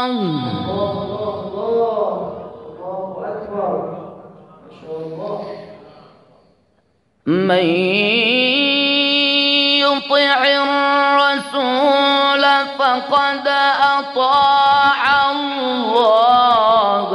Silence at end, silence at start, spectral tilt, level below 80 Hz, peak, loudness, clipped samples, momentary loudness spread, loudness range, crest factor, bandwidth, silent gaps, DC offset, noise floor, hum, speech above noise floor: 0 s; 0 s; -5 dB/octave; -58 dBFS; -2 dBFS; -15 LUFS; under 0.1%; 15 LU; 14 LU; 14 dB; 11.5 kHz; none; under 0.1%; -61 dBFS; none; 46 dB